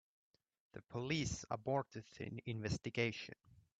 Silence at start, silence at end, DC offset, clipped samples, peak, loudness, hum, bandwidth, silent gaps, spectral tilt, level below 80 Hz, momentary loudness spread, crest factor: 0.75 s; 0.2 s; under 0.1%; under 0.1%; -22 dBFS; -42 LUFS; none; 9 kHz; none; -5 dB/octave; -66 dBFS; 14 LU; 22 dB